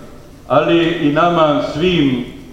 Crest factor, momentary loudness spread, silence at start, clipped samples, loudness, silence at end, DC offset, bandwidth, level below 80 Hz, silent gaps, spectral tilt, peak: 14 dB; 4 LU; 0 s; under 0.1%; -14 LUFS; 0 s; under 0.1%; 9 kHz; -40 dBFS; none; -7 dB/octave; 0 dBFS